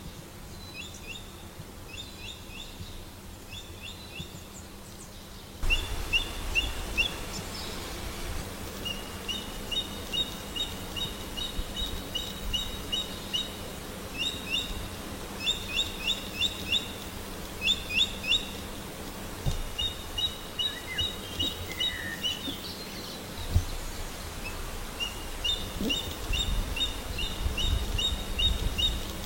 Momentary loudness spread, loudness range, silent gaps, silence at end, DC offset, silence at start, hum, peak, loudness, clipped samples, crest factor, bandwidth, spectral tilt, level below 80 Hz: 14 LU; 12 LU; none; 0 s; under 0.1%; 0 s; none; -12 dBFS; -31 LUFS; under 0.1%; 22 dB; 16.5 kHz; -2.5 dB/octave; -38 dBFS